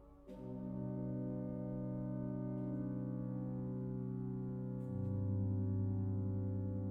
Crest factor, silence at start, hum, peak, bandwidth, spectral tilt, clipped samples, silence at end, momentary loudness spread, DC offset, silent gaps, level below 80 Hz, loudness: 12 dB; 0 s; none; -28 dBFS; 2.2 kHz; -12.5 dB/octave; under 0.1%; 0 s; 5 LU; under 0.1%; none; -62 dBFS; -42 LUFS